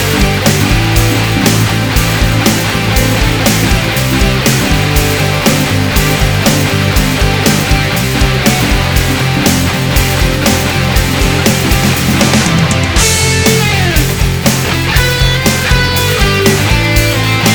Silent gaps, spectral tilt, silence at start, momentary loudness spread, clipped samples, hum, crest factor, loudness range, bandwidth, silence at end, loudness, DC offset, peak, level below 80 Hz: none; -4 dB/octave; 0 s; 2 LU; 0.5%; none; 10 dB; 1 LU; over 20 kHz; 0 s; -10 LUFS; 0.2%; 0 dBFS; -18 dBFS